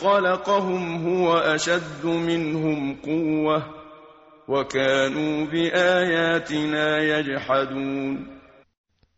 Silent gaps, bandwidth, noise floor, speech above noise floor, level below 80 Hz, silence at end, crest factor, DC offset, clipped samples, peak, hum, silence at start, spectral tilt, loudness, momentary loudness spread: none; 8 kHz; -49 dBFS; 27 dB; -58 dBFS; 0.8 s; 16 dB; under 0.1%; under 0.1%; -6 dBFS; none; 0 s; -3.5 dB/octave; -23 LUFS; 7 LU